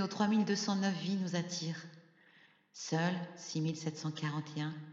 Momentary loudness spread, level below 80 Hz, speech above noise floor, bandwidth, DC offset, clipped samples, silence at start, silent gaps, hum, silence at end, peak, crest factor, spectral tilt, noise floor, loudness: 10 LU; -88 dBFS; 30 dB; 7.8 kHz; under 0.1%; under 0.1%; 0 s; none; none; 0 s; -18 dBFS; 18 dB; -5 dB/octave; -65 dBFS; -36 LUFS